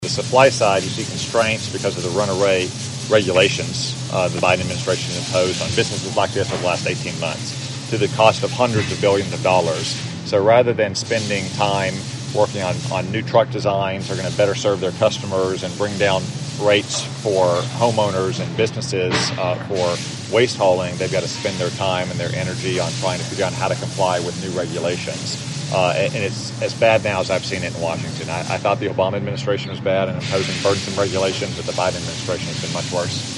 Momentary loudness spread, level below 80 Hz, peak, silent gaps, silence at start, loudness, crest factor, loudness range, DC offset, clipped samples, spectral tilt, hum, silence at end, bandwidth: 8 LU; -54 dBFS; 0 dBFS; none; 0 s; -20 LUFS; 20 dB; 3 LU; under 0.1%; under 0.1%; -4.5 dB/octave; none; 0 s; 11.5 kHz